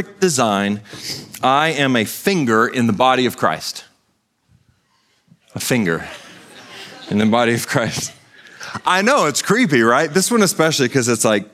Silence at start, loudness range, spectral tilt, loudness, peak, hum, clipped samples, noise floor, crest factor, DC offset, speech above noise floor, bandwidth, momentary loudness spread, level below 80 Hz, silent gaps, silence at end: 0 s; 8 LU; -4 dB/octave; -17 LUFS; 0 dBFS; none; under 0.1%; -65 dBFS; 18 dB; under 0.1%; 49 dB; 16 kHz; 16 LU; -60 dBFS; none; 0.1 s